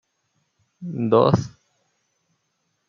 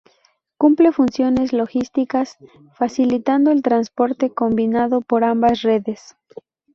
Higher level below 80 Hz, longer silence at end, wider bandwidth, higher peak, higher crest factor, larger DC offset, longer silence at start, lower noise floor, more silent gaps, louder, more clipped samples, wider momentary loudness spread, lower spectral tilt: second, -60 dBFS vs -54 dBFS; first, 1.4 s vs 0.8 s; about the same, 7.4 kHz vs 7 kHz; about the same, -2 dBFS vs -2 dBFS; first, 22 dB vs 16 dB; neither; first, 0.8 s vs 0.6 s; first, -73 dBFS vs -61 dBFS; neither; about the same, -20 LUFS vs -18 LUFS; neither; first, 21 LU vs 7 LU; first, -8 dB/octave vs -6.5 dB/octave